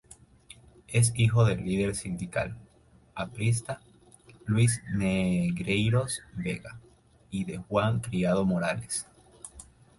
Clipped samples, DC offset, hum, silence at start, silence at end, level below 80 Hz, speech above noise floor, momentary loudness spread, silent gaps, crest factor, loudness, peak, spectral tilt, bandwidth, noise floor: under 0.1%; under 0.1%; none; 0.9 s; 0.35 s; -52 dBFS; 32 dB; 18 LU; none; 18 dB; -28 LUFS; -12 dBFS; -5.5 dB/octave; 11.5 kHz; -60 dBFS